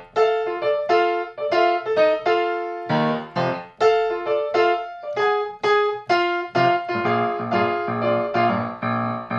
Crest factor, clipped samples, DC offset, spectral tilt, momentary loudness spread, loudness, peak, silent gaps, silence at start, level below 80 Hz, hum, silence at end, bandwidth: 16 dB; under 0.1%; under 0.1%; -6.5 dB/octave; 5 LU; -21 LUFS; -6 dBFS; none; 0 s; -62 dBFS; none; 0 s; 7.6 kHz